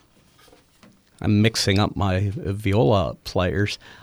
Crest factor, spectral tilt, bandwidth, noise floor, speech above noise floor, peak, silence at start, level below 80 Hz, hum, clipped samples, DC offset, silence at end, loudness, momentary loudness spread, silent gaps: 18 dB; -5.5 dB/octave; 15 kHz; -55 dBFS; 34 dB; -4 dBFS; 1.2 s; -44 dBFS; none; under 0.1%; under 0.1%; 0.1 s; -22 LUFS; 8 LU; none